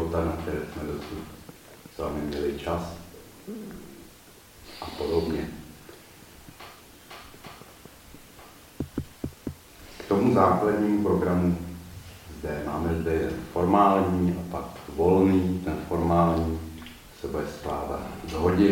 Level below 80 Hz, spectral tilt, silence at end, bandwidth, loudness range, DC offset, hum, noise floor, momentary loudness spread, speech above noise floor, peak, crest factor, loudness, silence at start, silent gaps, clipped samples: -44 dBFS; -7.5 dB/octave; 0 s; 17 kHz; 16 LU; under 0.1%; none; -51 dBFS; 25 LU; 26 dB; -6 dBFS; 20 dB; -26 LUFS; 0 s; none; under 0.1%